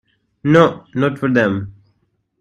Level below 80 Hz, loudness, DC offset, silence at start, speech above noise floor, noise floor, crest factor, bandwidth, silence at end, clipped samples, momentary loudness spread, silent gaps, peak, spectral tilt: -54 dBFS; -16 LUFS; under 0.1%; 0.45 s; 50 dB; -65 dBFS; 18 dB; 9.6 kHz; 0.7 s; under 0.1%; 13 LU; none; 0 dBFS; -7.5 dB/octave